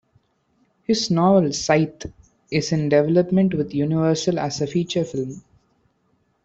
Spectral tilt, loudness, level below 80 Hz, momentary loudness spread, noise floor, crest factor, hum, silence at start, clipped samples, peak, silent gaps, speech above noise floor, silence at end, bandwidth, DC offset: -6 dB/octave; -20 LUFS; -54 dBFS; 13 LU; -66 dBFS; 18 dB; none; 0.9 s; under 0.1%; -4 dBFS; none; 46 dB; 1.05 s; 8 kHz; under 0.1%